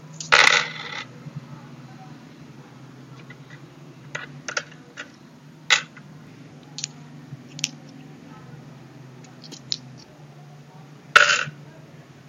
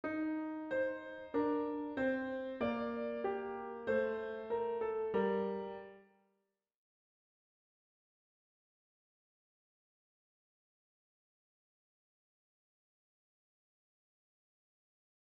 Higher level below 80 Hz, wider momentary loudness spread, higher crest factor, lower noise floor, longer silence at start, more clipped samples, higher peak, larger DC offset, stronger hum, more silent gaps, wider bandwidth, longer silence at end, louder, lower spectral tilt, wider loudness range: first, -68 dBFS vs -74 dBFS; first, 29 LU vs 7 LU; first, 28 dB vs 18 dB; second, -47 dBFS vs -84 dBFS; about the same, 0.05 s vs 0.05 s; neither; first, 0 dBFS vs -24 dBFS; neither; neither; neither; first, 16 kHz vs 5.8 kHz; second, 0.65 s vs 9.25 s; first, -21 LUFS vs -38 LUFS; second, -1 dB/octave vs -5 dB/octave; first, 14 LU vs 5 LU